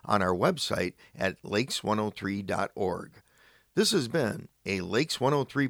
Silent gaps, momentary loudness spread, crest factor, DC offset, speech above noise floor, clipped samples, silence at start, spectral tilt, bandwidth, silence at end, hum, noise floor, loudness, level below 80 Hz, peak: none; 8 LU; 20 dB; under 0.1%; 33 dB; under 0.1%; 0.05 s; -4.5 dB/octave; over 20 kHz; 0 s; none; -62 dBFS; -29 LUFS; -62 dBFS; -8 dBFS